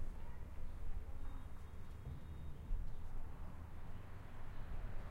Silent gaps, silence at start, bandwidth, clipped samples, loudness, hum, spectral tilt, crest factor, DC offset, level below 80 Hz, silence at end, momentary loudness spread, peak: none; 0 s; 4.3 kHz; under 0.1%; -53 LUFS; none; -7 dB/octave; 14 dB; under 0.1%; -46 dBFS; 0 s; 5 LU; -30 dBFS